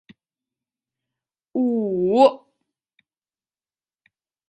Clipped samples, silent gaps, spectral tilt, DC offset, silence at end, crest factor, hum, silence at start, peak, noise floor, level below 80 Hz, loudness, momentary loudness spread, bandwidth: under 0.1%; none; -7.5 dB/octave; under 0.1%; 2.15 s; 22 dB; none; 1.55 s; -4 dBFS; under -90 dBFS; -70 dBFS; -20 LUFS; 14 LU; 8.8 kHz